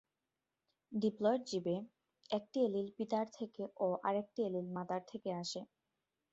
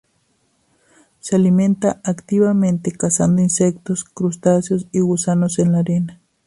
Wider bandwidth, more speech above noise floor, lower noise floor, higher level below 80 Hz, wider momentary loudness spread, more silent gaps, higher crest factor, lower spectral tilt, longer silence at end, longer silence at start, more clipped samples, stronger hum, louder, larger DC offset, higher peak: second, 8 kHz vs 11.5 kHz; first, over 52 dB vs 47 dB; first, under -90 dBFS vs -63 dBFS; second, -82 dBFS vs -54 dBFS; about the same, 10 LU vs 8 LU; neither; about the same, 18 dB vs 16 dB; about the same, -5.5 dB/octave vs -6.5 dB/octave; first, 0.7 s vs 0.35 s; second, 0.9 s vs 1.25 s; neither; neither; second, -39 LUFS vs -17 LUFS; neither; second, -20 dBFS vs -2 dBFS